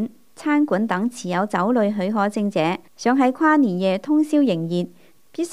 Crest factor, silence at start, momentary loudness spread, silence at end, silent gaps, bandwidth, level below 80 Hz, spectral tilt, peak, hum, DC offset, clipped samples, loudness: 14 dB; 0 s; 9 LU; 0 s; none; 12.5 kHz; -70 dBFS; -6.5 dB/octave; -6 dBFS; none; 0.3%; under 0.1%; -21 LUFS